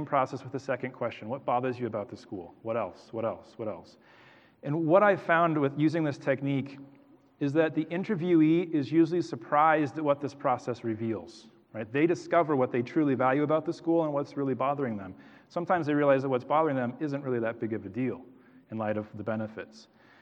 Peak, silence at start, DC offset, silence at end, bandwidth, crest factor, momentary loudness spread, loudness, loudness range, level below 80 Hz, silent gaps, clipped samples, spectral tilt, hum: -8 dBFS; 0 s; under 0.1%; 0.4 s; 8.2 kHz; 20 dB; 14 LU; -29 LUFS; 7 LU; -78 dBFS; none; under 0.1%; -8 dB/octave; none